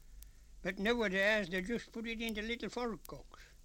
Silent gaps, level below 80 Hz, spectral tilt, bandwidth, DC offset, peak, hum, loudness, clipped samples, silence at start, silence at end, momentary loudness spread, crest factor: none; -56 dBFS; -4.5 dB/octave; 16.5 kHz; under 0.1%; -18 dBFS; none; -36 LUFS; under 0.1%; 0 s; 0 s; 13 LU; 20 dB